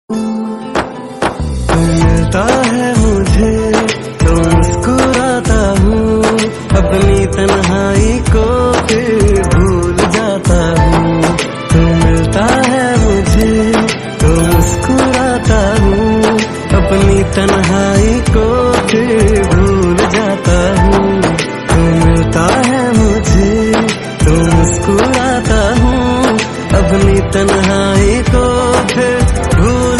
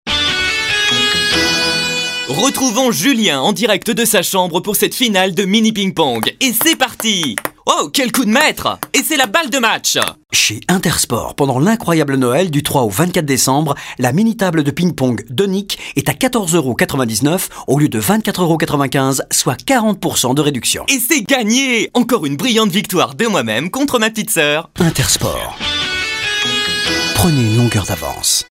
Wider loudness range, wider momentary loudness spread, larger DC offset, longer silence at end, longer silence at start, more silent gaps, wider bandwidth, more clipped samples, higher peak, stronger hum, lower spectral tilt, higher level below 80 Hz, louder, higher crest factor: about the same, 1 LU vs 2 LU; about the same, 3 LU vs 4 LU; neither; about the same, 0 s vs 0.05 s; about the same, 0.1 s vs 0.05 s; neither; second, 14 kHz vs 16.5 kHz; first, 0.1% vs under 0.1%; about the same, 0 dBFS vs 0 dBFS; neither; first, -5.5 dB/octave vs -3.5 dB/octave; first, -18 dBFS vs -42 dBFS; first, -11 LUFS vs -14 LUFS; about the same, 10 dB vs 14 dB